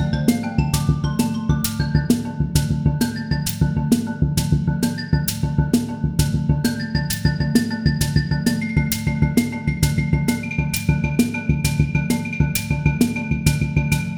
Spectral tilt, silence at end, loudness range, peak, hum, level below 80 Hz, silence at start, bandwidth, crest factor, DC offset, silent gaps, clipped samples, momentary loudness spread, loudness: -5.5 dB/octave; 0 s; 1 LU; 0 dBFS; none; -30 dBFS; 0 s; over 20 kHz; 18 dB; under 0.1%; none; under 0.1%; 2 LU; -20 LUFS